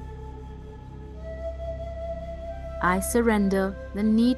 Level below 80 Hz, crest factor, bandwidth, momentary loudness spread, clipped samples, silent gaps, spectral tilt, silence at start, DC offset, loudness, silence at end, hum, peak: -38 dBFS; 18 dB; 12.5 kHz; 19 LU; under 0.1%; none; -6 dB/octave; 0 s; under 0.1%; -27 LUFS; 0 s; none; -8 dBFS